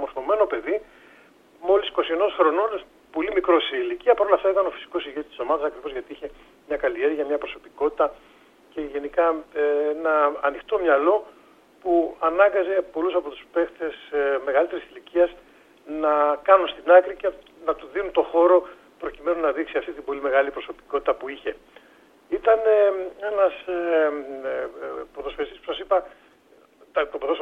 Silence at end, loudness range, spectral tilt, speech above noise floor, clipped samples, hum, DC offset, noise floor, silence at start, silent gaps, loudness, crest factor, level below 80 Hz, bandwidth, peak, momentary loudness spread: 0 s; 6 LU; -5 dB/octave; 33 dB; under 0.1%; none; under 0.1%; -56 dBFS; 0 s; none; -23 LUFS; 22 dB; -56 dBFS; 4.8 kHz; -2 dBFS; 14 LU